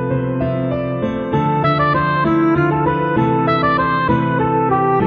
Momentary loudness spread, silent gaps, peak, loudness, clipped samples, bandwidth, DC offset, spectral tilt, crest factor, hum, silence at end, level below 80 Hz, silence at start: 5 LU; none; -2 dBFS; -16 LUFS; under 0.1%; 6.2 kHz; under 0.1%; -6 dB/octave; 14 dB; none; 0 s; -40 dBFS; 0 s